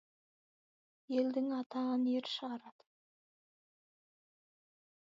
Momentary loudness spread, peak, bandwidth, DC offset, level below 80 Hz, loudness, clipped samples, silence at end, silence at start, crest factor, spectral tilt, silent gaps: 8 LU; -22 dBFS; 7.4 kHz; under 0.1%; under -90 dBFS; -37 LUFS; under 0.1%; 2.35 s; 1.1 s; 20 dB; -2.5 dB/octave; 1.66-1.70 s